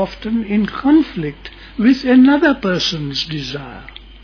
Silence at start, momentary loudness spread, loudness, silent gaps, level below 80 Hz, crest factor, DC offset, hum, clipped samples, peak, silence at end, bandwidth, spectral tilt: 0 s; 19 LU; -15 LUFS; none; -40 dBFS; 14 dB; under 0.1%; none; under 0.1%; -2 dBFS; 0.05 s; 5.4 kHz; -5.5 dB/octave